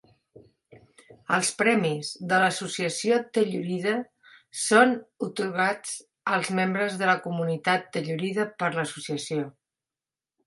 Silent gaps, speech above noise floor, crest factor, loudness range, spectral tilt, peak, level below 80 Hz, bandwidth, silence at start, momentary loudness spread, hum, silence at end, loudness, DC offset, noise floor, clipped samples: none; over 64 dB; 22 dB; 3 LU; -4 dB/octave; -4 dBFS; -74 dBFS; 11.5 kHz; 0.35 s; 10 LU; none; 0.95 s; -26 LUFS; under 0.1%; under -90 dBFS; under 0.1%